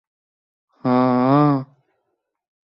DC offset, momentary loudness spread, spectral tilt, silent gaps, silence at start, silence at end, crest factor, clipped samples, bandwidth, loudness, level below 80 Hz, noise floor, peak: under 0.1%; 9 LU; -11 dB/octave; none; 0.85 s; 1.15 s; 16 dB; under 0.1%; 5.8 kHz; -18 LUFS; -66 dBFS; -75 dBFS; -6 dBFS